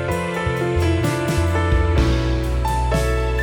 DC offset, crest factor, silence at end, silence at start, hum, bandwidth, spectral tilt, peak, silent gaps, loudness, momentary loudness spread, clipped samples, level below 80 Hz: under 0.1%; 14 dB; 0 s; 0 s; none; 18 kHz; -6.5 dB/octave; -4 dBFS; none; -20 LUFS; 3 LU; under 0.1%; -24 dBFS